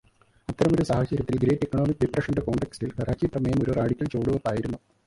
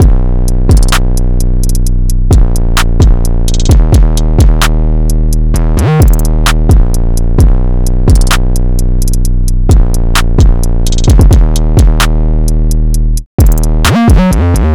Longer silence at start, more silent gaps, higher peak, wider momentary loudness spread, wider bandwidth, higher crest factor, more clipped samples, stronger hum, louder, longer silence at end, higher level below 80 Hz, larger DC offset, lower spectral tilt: first, 0.5 s vs 0 s; second, none vs 13.26-13.38 s; second, -8 dBFS vs 0 dBFS; about the same, 7 LU vs 6 LU; second, 11.5 kHz vs 15.5 kHz; first, 18 dB vs 6 dB; neither; neither; second, -26 LUFS vs -10 LUFS; first, 0.3 s vs 0 s; second, -44 dBFS vs -6 dBFS; second, under 0.1% vs 1%; first, -8 dB/octave vs -5.5 dB/octave